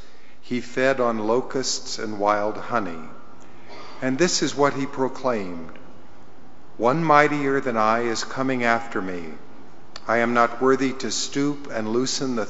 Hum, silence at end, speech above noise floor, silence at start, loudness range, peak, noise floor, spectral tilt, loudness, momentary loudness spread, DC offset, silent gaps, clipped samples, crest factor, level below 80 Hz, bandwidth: none; 0 s; 27 dB; 0.45 s; 4 LU; 0 dBFS; -49 dBFS; -3.5 dB/octave; -23 LUFS; 16 LU; 3%; none; under 0.1%; 24 dB; -60 dBFS; 8 kHz